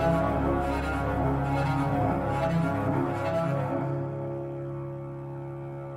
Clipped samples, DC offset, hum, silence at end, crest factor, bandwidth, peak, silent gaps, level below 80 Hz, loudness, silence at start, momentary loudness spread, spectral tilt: under 0.1%; under 0.1%; none; 0 s; 16 dB; 13.5 kHz; -12 dBFS; none; -40 dBFS; -29 LUFS; 0 s; 11 LU; -8.5 dB/octave